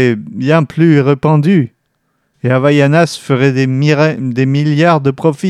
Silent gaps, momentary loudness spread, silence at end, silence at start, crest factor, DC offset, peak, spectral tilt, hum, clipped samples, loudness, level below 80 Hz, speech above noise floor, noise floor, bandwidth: none; 5 LU; 0 s; 0 s; 12 dB; under 0.1%; 0 dBFS; -7.5 dB/octave; none; under 0.1%; -11 LUFS; -56 dBFS; 53 dB; -64 dBFS; 11.5 kHz